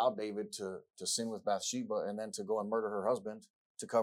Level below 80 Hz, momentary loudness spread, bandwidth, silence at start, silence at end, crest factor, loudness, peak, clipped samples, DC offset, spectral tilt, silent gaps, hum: -88 dBFS; 11 LU; 17.5 kHz; 0 s; 0 s; 18 dB; -37 LUFS; -18 dBFS; under 0.1%; under 0.1%; -3 dB/octave; 3.50-3.75 s; none